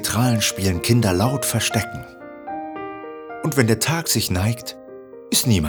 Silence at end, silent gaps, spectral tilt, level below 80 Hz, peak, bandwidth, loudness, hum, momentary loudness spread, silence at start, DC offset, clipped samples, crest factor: 0 s; none; -4 dB/octave; -46 dBFS; 0 dBFS; over 20 kHz; -20 LUFS; none; 17 LU; 0 s; under 0.1%; under 0.1%; 20 dB